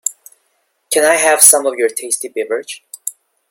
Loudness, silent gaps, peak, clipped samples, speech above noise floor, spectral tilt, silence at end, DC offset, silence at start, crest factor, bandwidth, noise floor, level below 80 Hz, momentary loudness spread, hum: -12 LUFS; none; 0 dBFS; 0.3%; 51 dB; 0.5 dB/octave; 0.4 s; under 0.1%; 0.05 s; 16 dB; 16.5 kHz; -64 dBFS; -66 dBFS; 20 LU; none